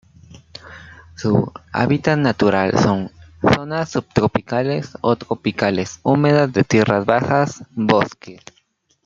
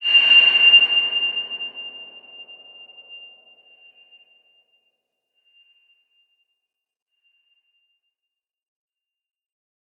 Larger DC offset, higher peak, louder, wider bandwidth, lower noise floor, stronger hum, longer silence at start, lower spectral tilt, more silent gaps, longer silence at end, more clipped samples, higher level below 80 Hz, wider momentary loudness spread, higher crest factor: neither; first, 0 dBFS vs -4 dBFS; second, -18 LUFS vs -13 LUFS; first, 7.6 kHz vs 6.2 kHz; second, -62 dBFS vs -86 dBFS; neither; first, 0.3 s vs 0 s; first, -6.5 dB/octave vs 0 dB/octave; neither; second, 0.7 s vs 6.8 s; neither; first, -50 dBFS vs under -90 dBFS; second, 9 LU vs 25 LU; about the same, 18 dB vs 20 dB